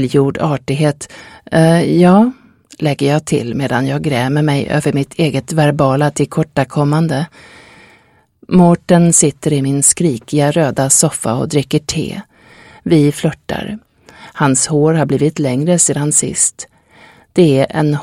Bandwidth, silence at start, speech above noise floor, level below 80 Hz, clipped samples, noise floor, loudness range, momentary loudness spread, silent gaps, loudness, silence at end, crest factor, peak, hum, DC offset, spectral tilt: 15.5 kHz; 0 s; 38 dB; -46 dBFS; under 0.1%; -51 dBFS; 4 LU; 10 LU; none; -13 LUFS; 0 s; 14 dB; 0 dBFS; none; under 0.1%; -5 dB/octave